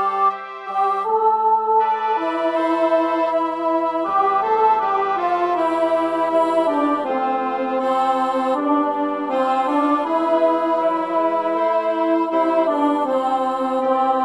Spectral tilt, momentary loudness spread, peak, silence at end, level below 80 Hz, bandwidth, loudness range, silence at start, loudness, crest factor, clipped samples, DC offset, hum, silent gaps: -5 dB/octave; 4 LU; -6 dBFS; 0 s; -70 dBFS; 10.5 kHz; 1 LU; 0 s; -19 LUFS; 12 dB; under 0.1%; under 0.1%; none; none